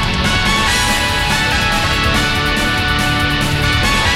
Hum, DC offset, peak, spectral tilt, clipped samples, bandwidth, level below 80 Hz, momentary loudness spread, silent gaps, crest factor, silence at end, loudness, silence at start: none; 0.4%; 0 dBFS; -3.5 dB/octave; under 0.1%; 17 kHz; -24 dBFS; 2 LU; none; 14 dB; 0 s; -14 LUFS; 0 s